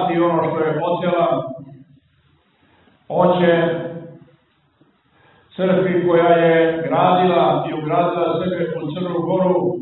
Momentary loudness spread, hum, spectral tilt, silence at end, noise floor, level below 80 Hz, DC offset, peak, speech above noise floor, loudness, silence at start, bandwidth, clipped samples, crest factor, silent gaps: 10 LU; none; -11.5 dB/octave; 0 s; -59 dBFS; -60 dBFS; under 0.1%; -2 dBFS; 42 dB; -17 LUFS; 0 s; 4.1 kHz; under 0.1%; 18 dB; none